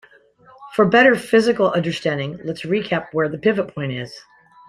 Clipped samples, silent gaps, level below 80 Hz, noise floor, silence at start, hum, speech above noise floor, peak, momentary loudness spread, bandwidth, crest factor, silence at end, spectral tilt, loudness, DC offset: under 0.1%; none; -58 dBFS; -50 dBFS; 0.6 s; none; 32 dB; -2 dBFS; 14 LU; 14 kHz; 18 dB; 0.5 s; -6 dB/octave; -19 LUFS; under 0.1%